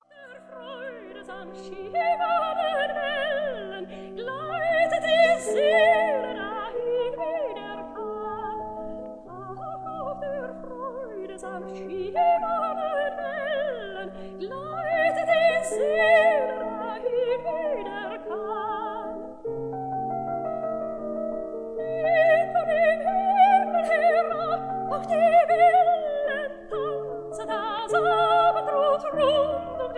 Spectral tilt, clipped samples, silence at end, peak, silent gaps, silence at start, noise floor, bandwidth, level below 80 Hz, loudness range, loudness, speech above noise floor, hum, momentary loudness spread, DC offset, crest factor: -4 dB/octave; under 0.1%; 0 s; -8 dBFS; none; 0.15 s; -47 dBFS; 11 kHz; -58 dBFS; 10 LU; -24 LUFS; 24 dB; none; 17 LU; under 0.1%; 18 dB